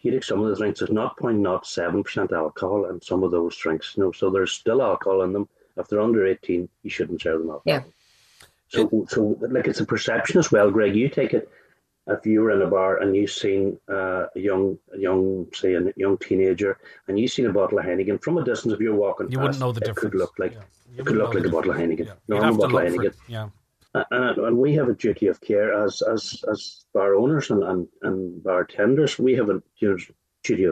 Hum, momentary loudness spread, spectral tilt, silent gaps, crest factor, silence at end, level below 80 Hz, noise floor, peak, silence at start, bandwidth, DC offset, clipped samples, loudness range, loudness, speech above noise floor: none; 8 LU; -6 dB/octave; none; 18 dB; 0 s; -60 dBFS; -55 dBFS; -6 dBFS; 0.05 s; 12.5 kHz; under 0.1%; under 0.1%; 3 LU; -23 LUFS; 33 dB